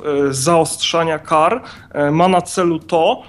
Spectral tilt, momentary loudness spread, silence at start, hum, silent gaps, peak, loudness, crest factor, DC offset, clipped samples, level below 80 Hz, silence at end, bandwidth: -4.5 dB/octave; 4 LU; 0 s; none; none; -2 dBFS; -16 LUFS; 14 dB; under 0.1%; under 0.1%; -54 dBFS; 0.05 s; 13 kHz